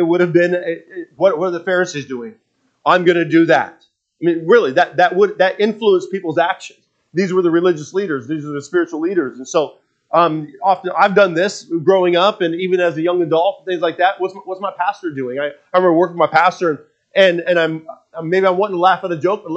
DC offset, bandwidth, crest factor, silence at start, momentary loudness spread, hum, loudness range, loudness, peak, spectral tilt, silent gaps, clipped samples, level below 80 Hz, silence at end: under 0.1%; 8 kHz; 16 dB; 0 s; 11 LU; none; 4 LU; -16 LUFS; 0 dBFS; -5.5 dB/octave; none; under 0.1%; -72 dBFS; 0 s